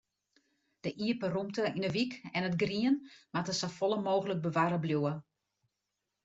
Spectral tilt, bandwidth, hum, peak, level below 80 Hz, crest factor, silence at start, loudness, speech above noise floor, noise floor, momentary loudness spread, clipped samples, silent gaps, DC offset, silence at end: -5.5 dB/octave; 8 kHz; none; -16 dBFS; -72 dBFS; 18 dB; 0.85 s; -33 LUFS; 54 dB; -86 dBFS; 6 LU; under 0.1%; none; under 0.1%; 1.05 s